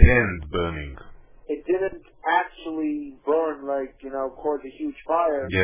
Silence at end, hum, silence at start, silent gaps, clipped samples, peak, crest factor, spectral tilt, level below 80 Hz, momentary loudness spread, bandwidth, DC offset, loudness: 0 s; none; 0 s; none; under 0.1%; 0 dBFS; 24 dB; -10.5 dB/octave; -28 dBFS; 10 LU; 3.7 kHz; under 0.1%; -26 LUFS